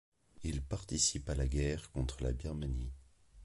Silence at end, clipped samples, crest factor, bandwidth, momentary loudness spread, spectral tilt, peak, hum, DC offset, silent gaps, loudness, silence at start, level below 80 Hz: 0 s; under 0.1%; 18 dB; 11.5 kHz; 11 LU; -4 dB/octave; -20 dBFS; none; under 0.1%; none; -37 LUFS; 0.35 s; -42 dBFS